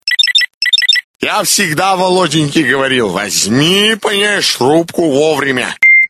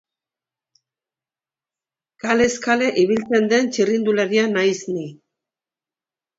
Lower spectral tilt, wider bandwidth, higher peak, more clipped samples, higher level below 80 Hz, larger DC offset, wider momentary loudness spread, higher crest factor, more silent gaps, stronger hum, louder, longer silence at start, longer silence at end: second, -2.5 dB/octave vs -4.5 dB/octave; first, 15 kHz vs 8 kHz; about the same, 0 dBFS vs -2 dBFS; neither; first, -52 dBFS vs -60 dBFS; neither; second, 5 LU vs 10 LU; second, 12 dB vs 18 dB; first, 0.54-0.61 s, 1.04-1.19 s vs none; neither; first, -10 LUFS vs -19 LUFS; second, 0.05 s vs 2.25 s; second, 0 s vs 1.25 s